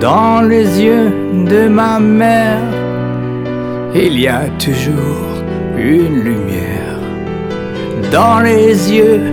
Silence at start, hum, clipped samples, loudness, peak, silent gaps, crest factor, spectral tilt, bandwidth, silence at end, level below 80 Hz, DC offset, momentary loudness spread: 0 s; none; under 0.1%; -12 LUFS; 0 dBFS; none; 10 dB; -6.5 dB/octave; 17.5 kHz; 0 s; -38 dBFS; under 0.1%; 11 LU